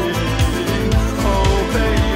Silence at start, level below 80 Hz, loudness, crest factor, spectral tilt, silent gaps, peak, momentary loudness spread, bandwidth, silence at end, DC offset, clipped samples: 0 s; -20 dBFS; -17 LUFS; 14 dB; -5.5 dB/octave; none; -2 dBFS; 2 LU; 16.5 kHz; 0 s; under 0.1%; under 0.1%